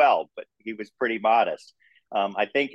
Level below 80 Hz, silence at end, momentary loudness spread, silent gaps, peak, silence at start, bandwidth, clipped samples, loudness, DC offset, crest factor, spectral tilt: -80 dBFS; 0.05 s; 16 LU; none; -8 dBFS; 0 s; 8.8 kHz; under 0.1%; -25 LUFS; under 0.1%; 16 dB; -5 dB/octave